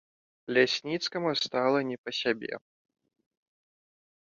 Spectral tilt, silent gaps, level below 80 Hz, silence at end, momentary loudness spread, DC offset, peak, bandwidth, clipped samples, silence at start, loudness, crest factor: -4 dB/octave; 1.98-2.04 s; -76 dBFS; 1.75 s; 12 LU; under 0.1%; -10 dBFS; 7.6 kHz; under 0.1%; 0.5 s; -29 LUFS; 22 dB